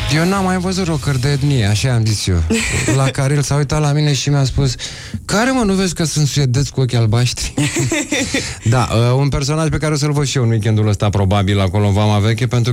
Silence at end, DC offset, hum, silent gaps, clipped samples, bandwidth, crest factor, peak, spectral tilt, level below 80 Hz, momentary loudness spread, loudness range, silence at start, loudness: 0 s; under 0.1%; none; none; under 0.1%; 16 kHz; 12 dB; -4 dBFS; -5 dB/octave; -32 dBFS; 3 LU; 1 LU; 0 s; -16 LUFS